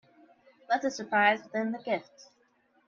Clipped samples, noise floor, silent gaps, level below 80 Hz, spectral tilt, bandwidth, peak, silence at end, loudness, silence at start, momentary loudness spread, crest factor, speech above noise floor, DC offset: under 0.1%; -69 dBFS; none; -80 dBFS; -4 dB/octave; 7.6 kHz; -12 dBFS; 0.65 s; -29 LUFS; 0.7 s; 9 LU; 20 dB; 39 dB; under 0.1%